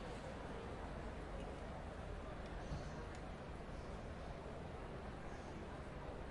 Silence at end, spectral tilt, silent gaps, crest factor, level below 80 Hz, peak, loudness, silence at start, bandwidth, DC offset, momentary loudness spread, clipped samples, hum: 0 s; -6.5 dB/octave; none; 14 dB; -54 dBFS; -34 dBFS; -50 LUFS; 0 s; 11 kHz; under 0.1%; 2 LU; under 0.1%; none